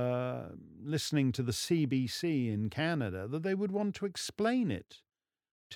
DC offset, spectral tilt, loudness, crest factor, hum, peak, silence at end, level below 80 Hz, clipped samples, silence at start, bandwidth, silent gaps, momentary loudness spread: under 0.1%; -5.5 dB/octave; -34 LUFS; 16 dB; none; -18 dBFS; 0 s; -70 dBFS; under 0.1%; 0 s; 18 kHz; 5.51-5.70 s; 7 LU